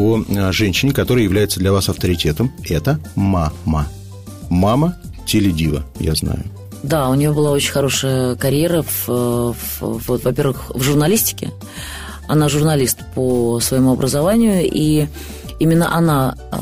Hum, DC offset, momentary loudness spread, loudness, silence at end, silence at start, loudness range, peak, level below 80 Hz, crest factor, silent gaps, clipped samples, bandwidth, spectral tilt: none; 0.4%; 11 LU; -17 LUFS; 0 s; 0 s; 3 LU; -4 dBFS; -34 dBFS; 12 dB; none; under 0.1%; 16 kHz; -5.5 dB/octave